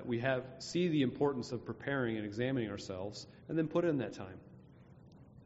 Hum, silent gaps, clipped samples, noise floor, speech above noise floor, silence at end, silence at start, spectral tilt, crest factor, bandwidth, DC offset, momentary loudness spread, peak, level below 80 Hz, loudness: none; none; under 0.1%; -58 dBFS; 22 dB; 0 s; 0 s; -5.5 dB/octave; 18 dB; 8 kHz; under 0.1%; 12 LU; -18 dBFS; -68 dBFS; -36 LUFS